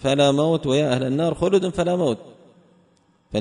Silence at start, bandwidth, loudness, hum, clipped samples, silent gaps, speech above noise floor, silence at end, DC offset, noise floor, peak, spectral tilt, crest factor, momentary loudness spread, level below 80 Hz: 0 s; 10.5 kHz; -21 LUFS; none; under 0.1%; none; 41 dB; 0 s; under 0.1%; -60 dBFS; -6 dBFS; -6 dB/octave; 16 dB; 7 LU; -50 dBFS